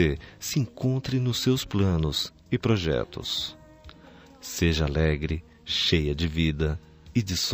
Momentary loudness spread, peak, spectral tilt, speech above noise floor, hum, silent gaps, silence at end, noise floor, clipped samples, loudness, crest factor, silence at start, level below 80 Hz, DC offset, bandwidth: 7 LU; -8 dBFS; -5 dB/octave; 25 dB; none; none; 0 s; -50 dBFS; under 0.1%; -27 LUFS; 20 dB; 0 s; -38 dBFS; under 0.1%; 15.5 kHz